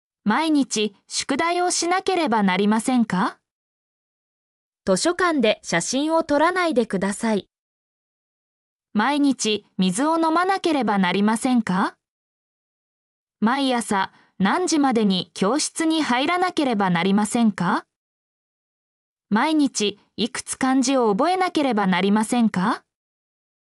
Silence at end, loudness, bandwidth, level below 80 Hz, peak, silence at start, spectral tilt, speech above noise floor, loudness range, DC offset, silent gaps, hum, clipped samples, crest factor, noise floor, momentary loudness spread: 0.95 s; -21 LUFS; 12 kHz; -64 dBFS; -8 dBFS; 0.25 s; -4.5 dB/octave; over 70 dB; 3 LU; under 0.1%; 3.51-4.73 s, 7.59-8.80 s, 12.08-13.27 s, 17.96-19.17 s; none; under 0.1%; 14 dB; under -90 dBFS; 6 LU